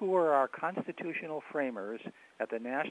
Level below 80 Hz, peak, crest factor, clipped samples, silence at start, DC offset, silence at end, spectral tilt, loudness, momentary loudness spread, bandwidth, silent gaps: -90 dBFS; -14 dBFS; 20 dB; under 0.1%; 0 s; under 0.1%; 0 s; -7 dB/octave; -34 LUFS; 14 LU; 10.5 kHz; none